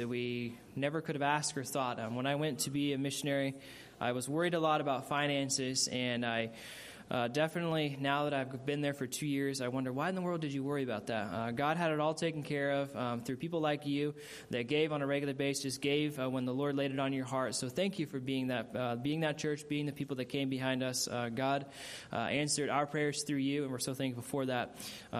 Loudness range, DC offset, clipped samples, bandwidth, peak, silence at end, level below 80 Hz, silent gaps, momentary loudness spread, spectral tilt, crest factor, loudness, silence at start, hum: 2 LU; under 0.1%; under 0.1%; 15 kHz; -16 dBFS; 0 s; -72 dBFS; none; 6 LU; -4.5 dB/octave; 18 dB; -35 LUFS; 0 s; none